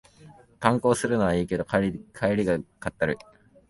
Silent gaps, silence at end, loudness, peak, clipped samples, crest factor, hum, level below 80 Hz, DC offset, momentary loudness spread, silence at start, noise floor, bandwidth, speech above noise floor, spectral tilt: none; 0.55 s; -26 LUFS; -4 dBFS; under 0.1%; 22 dB; none; -50 dBFS; under 0.1%; 6 LU; 0.25 s; -52 dBFS; 11.5 kHz; 27 dB; -6 dB/octave